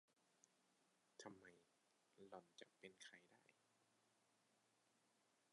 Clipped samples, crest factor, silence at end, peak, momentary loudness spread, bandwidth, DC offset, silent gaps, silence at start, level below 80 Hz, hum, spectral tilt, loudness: under 0.1%; 26 dB; 0 s; -42 dBFS; 4 LU; 11 kHz; under 0.1%; none; 0.1 s; under -90 dBFS; none; -3 dB/octave; -64 LUFS